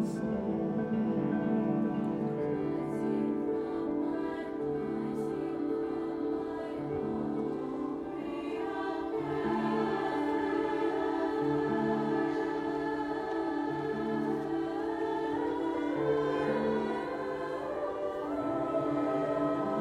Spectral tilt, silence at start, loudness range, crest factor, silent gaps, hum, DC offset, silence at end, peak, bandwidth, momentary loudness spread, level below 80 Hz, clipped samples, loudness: -8 dB/octave; 0 s; 3 LU; 14 dB; none; none; under 0.1%; 0 s; -18 dBFS; 11 kHz; 5 LU; -62 dBFS; under 0.1%; -33 LUFS